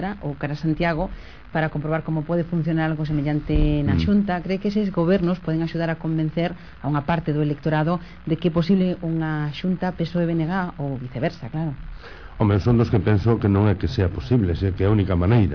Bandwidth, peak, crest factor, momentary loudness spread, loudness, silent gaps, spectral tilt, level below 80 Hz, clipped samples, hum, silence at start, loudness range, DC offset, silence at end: 5.4 kHz; -8 dBFS; 14 dB; 9 LU; -23 LUFS; none; -9 dB/octave; -36 dBFS; under 0.1%; none; 0 s; 3 LU; 0.5%; 0 s